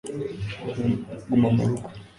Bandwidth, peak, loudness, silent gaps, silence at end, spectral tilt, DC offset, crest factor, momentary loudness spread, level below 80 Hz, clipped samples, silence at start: 11 kHz; -8 dBFS; -26 LUFS; none; 0.1 s; -8 dB/octave; under 0.1%; 16 dB; 12 LU; -50 dBFS; under 0.1%; 0.05 s